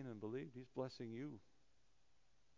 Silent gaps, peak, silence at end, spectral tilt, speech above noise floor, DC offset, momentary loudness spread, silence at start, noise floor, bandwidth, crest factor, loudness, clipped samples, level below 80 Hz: none; -32 dBFS; 1.15 s; -6.5 dB/octave; 31 dB; under 0.1%; 5 LU; 0 s; -80 dBFS; 7.2 kHz; 20 dB; -51 LUFS; under 0.1%; -84 dBFS